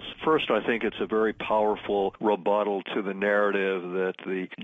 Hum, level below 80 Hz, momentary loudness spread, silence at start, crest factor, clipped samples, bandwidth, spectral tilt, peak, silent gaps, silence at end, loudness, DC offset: none; -60 dBFS; 6 LU; 0 s; 14 dB; under 0.1%; 3.9 kHz; -7 dB/octave; -12 dBFS; none; 0 s; -26 LUFS; under 0.1%